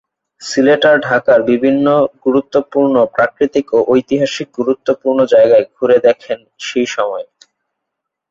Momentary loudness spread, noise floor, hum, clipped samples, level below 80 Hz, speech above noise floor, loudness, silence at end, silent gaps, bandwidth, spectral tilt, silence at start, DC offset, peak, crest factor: 10 LU; -78 dBFS; none; under 0.1%; -56 dBFS; 65 dB; -13 LUFS; 1.1 s; none; 7.8 kHz; -5 dB/octave; 0.4 s; under 0.1%; 0 dBFS; 12 dB